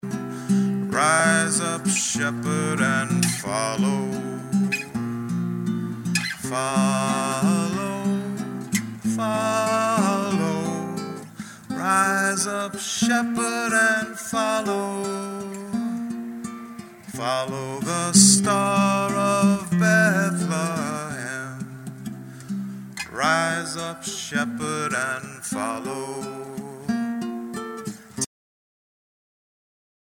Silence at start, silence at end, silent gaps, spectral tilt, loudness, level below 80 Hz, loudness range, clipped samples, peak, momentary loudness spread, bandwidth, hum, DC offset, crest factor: 0.05 s; 1.95 s; none; -4 dB/octave; -23 LUFS; -64 dBFS; 9 LU; under 0.1%; -2 dBFS; 14 LU; 17 kHz; none; under 0.1%; 22 dB